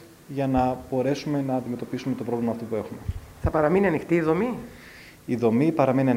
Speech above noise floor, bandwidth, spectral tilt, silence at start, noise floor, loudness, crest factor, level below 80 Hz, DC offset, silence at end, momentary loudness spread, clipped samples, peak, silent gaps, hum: 23 dB; 16 kHz; -8 dB/octave; 0 s; -46 dBFS; -25 LUFS; 18 dB; -44 dBFS; under 0.1%; 0 s; 15 LU; under 0.1%; -6 dBFS; none; none